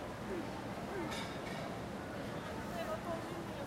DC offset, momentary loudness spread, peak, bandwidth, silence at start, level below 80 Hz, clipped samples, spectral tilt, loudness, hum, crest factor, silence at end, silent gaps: under 0.1%; 3 LU; -28 dBFS; 16 kHz; 0 s; -60 dBFS; under 0.1%; -5.5 dB/octave; -42 LUFS; none; 14 dB; 0 s; none